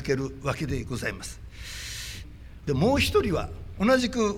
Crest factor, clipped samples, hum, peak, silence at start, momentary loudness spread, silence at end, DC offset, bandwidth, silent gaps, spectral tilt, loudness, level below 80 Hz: 16 dB; under 0.1%; none; -10 dBFS; 0 s; 17 LU; 0 s; under 0.1%; 18 kHz; none; -5 dB/octave; -27 LUFS; -42 dBFS